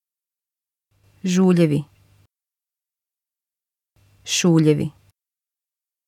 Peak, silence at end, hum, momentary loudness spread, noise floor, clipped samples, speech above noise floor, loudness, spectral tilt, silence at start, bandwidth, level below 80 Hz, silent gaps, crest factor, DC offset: -4 dBFS; 1.15 s; none; 14 LU; -90 dBFS; under 0.1%; 73 dB; -19 LUFS; -5.5 dB/octave; 1.25 s; 15.5 kHz; -62 dBFS; none; 20 dB; under 0.1%